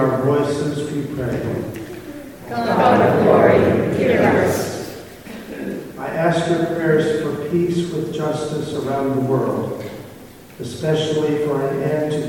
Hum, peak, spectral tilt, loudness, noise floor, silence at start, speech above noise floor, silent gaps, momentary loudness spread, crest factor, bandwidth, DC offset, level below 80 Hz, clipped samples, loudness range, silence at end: none; 0 dBFS; -6.5 dB/octave; -19 LUFS; -40 dBFS; 0 s; 22 dB; none; 19 LU; 18 dB; 17.5 kHz; 0.2%; -50 dBFS; under 0.1%; 6 LU; 0 s